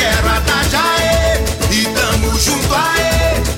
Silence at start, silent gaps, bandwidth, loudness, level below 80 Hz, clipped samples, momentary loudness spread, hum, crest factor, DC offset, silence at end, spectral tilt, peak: 0 s; none; 17 kHz; -13 LUFS; -20 dBFS; under 0.1%; 2 LU; none; 12 dB; under 0.1%; 0 s; -3.5 dB/octave; -2 dBFS